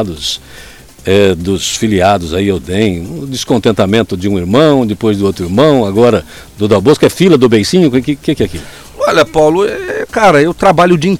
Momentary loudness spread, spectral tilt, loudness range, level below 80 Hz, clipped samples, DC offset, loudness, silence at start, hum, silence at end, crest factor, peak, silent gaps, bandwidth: 10 LU; -5.5 dB/octave; 3 LU; -38 dBFS; 0.5%; 0.5%; -11 LUFS; 0 s; none; 0 s; 10 dB; 0 dBFS; none; 16.5 kHz